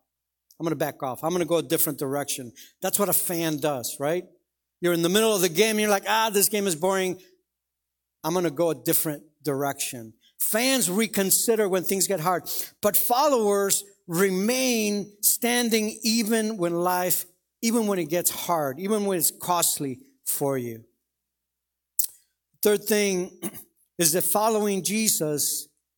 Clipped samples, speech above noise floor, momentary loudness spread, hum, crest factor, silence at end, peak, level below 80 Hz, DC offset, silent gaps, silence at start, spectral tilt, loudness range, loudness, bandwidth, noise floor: under 0.1%; 59 dB; 10 LU; none; 24 dB; 0.35 s; 0 dBFS; -70 dBFS; under 0.1%; none; 0.6 s; -3 dB/octave; 5 LU; -24 LUFS; 19 kHz; -84 dBFS